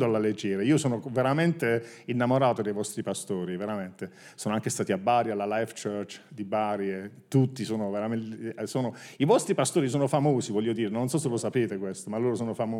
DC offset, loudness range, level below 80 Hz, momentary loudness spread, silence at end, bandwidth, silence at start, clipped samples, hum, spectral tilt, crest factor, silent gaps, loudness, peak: under 0.1%; 4 LU; -76 dBFS; 10 LU; 0 s; 16 kHz; 0 s; under 0.1%; none; -6 dB/octave; 18 dB; none; -28 LUFS; -8 dBFS